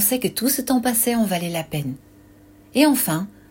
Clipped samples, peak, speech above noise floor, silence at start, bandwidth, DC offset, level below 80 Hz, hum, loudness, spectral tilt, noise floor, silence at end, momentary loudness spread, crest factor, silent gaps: under 0.1%; -4 dBFS; 28 dB; 0 s; 16.5 kHz; under 0.1%; -54 dBFS; none; -20 LUFS; -4 dB/octave; -49 dBFS; 0.2 s; 11 LU; 18 dB; none